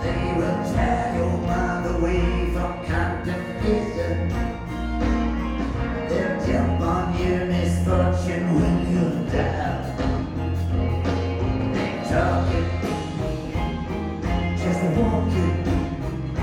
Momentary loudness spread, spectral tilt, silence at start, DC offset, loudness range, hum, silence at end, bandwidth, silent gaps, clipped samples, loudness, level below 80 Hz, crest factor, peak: 6 LU; -7.5 dB/octave; 0 s; under 0.1%; 3 LU; none; 0 s; 12 kHz; none; under 0.1%; -24 LUFS; -30 dBFS; 16 dB; -8 dBFS